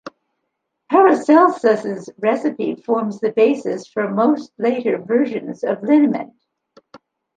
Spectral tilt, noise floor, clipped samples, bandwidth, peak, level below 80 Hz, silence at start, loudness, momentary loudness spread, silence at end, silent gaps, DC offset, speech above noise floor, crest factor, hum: -7 dB/octave; -75 dBFS; under 0.1%; 9.2 kHz; -2 dBFS; -70 dBFS; 0.05 s; -18 LUFS; 11 LU; 0.4 s; none; under 0.1%; 58 dB; 16 dB; none